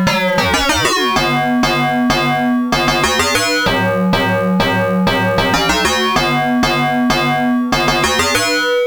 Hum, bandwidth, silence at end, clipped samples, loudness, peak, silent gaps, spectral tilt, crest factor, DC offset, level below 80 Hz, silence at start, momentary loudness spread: none; over 20 kHz; 0 s; under 0.1%; -14 LUFS; 0 dBFS; none; -4 dB/octave; 14 dB; under 0.1%; -34 dBFS; 0 s; 2 LU